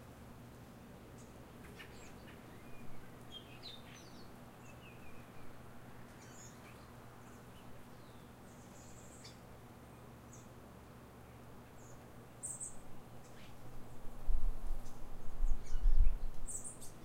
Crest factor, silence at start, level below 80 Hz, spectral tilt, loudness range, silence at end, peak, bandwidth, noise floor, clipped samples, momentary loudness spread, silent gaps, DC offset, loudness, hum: 20 dB; 0 s; -40 dBFS; -4 dB/octave; 12 LU; 0.05 s; -16 dBFS; 10.5 kHz; -56 dBFS; under 0.1%; 13 LU; none; under 0.1%; -49 LUFS; none